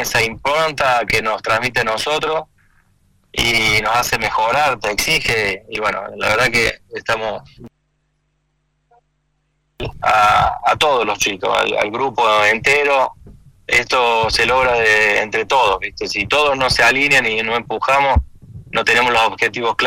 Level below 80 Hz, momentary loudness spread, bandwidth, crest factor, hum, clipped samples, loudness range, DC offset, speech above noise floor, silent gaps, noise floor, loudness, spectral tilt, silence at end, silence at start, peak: -36 dBFS; 8 LU; 16.5 kHz; 16 dB; 50 Hz at -55 dBFS; under 0.1%; 6 LU; under 0.1%; 50 dB; none; -66 dBFS; -15 LUFS; -2.5 dB/octave; 0 s; 0 s; -2 dBFS